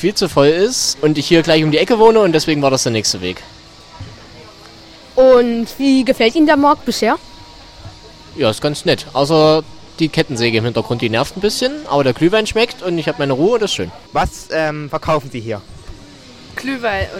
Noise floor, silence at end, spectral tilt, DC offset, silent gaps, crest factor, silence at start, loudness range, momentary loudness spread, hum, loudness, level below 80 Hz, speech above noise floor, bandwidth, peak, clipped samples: -39 dBFS; 0 s; -4.5 dB/octave; under 0.1%; none; 16 dB; 0 s; 5 LU; 12 LU; none; -15 LUFS; -40 dBFS; 25 dB; 16.5 kHz; 0 dBFS; under 0.1%